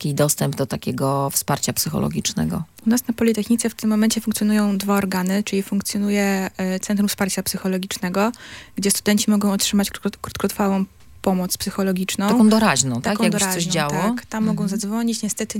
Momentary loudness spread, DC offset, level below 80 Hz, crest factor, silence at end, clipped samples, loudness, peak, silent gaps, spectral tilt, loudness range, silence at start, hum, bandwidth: 7 LU; under 0.1%; -52 dBFS; 18 dB; 0 s; under 0.1%; -20 LUFS; -2 dBFS; none; -4.5 dB/octave; 3 LU; 0 s; none; 17 kHz